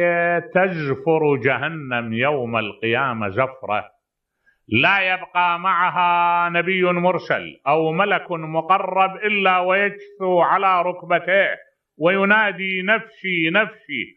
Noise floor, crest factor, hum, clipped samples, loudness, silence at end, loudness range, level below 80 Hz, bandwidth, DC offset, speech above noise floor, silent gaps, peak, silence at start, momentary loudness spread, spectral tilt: -75 dBFS; 18 dB; none; under 0.1%; -19 LUFS; 0.1 s; 3 LU; -68 dBFS; 6 kHz; under 0.1%; 56 dB; none; -2 dBFS; 0 s; 7 LU; -8 dB/octave